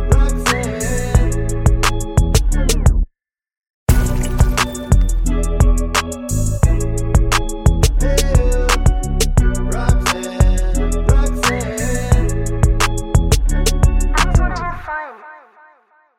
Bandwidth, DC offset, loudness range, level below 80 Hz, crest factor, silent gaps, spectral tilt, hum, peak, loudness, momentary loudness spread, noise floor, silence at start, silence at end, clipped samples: 16.5 kHz; under 0.1%; 2 LU; -16 dBFS; 14 dB; 3.57-3.61 s, 3.70-3.86 s; -5 dB/octave; none; 0 dBFS; -17 LUFS; 5 LU; -69 dBFS; 0 s; 0.8 s; under 0.1%